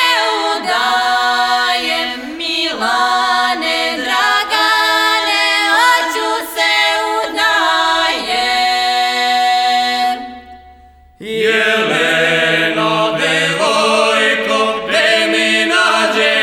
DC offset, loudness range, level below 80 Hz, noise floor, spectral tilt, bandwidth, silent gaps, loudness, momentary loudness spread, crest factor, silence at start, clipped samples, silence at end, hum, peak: under 0.1%; 3 LU; -52 dBFS; -43 dBFS; -2 dB/octave; 20 kHz; none; -13 LUFS; 5 LU; 14 dB; 0 s; under 0.1%; 0 s; none; 0 dBFS